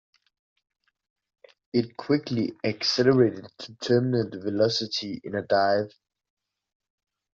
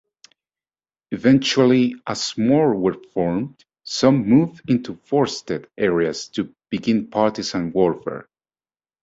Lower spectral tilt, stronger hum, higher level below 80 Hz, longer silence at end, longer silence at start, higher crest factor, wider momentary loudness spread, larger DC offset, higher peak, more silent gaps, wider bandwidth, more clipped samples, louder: about the same, -4.5 dB/octave vs -5.5 dB/octave; neither; second, -66 dBFS vs -56 dBFS; first, 1.45 s vs 0.8 s; first, 1.75 s vs 1.1 s; about the same, 20 dB vs 18 dB; about the same, 11 LU vs 12 LU; neither; second, -6 dBFS vs -2 dBFS; neither; about the same, 7.6 kHz vs 8 kHz; neither; second, -25 LUFS vs -20 LUFS